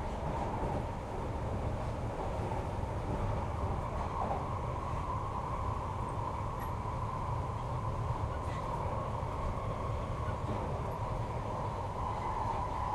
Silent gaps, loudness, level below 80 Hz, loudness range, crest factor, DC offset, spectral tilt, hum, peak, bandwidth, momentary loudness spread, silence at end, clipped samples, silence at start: none; -37 LUFS; -42 dBFS; 1 LU; 14 dB; under 0.1%; -7.5 dB/octave; none; -22 dBFS; 12.5 kHz; 2 LU; 0 s; under 0.1%; 0 s